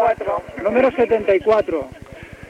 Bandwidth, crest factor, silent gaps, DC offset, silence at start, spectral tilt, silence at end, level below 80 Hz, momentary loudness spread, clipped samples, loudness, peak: 10.5 kHz; 14 dB; none; under 0.1%; 0 s; -6.5 dB/octave; 0.05 s; -46 dBFS; 18 LU; under 0.1%; -18 LUFS; -4 dBFS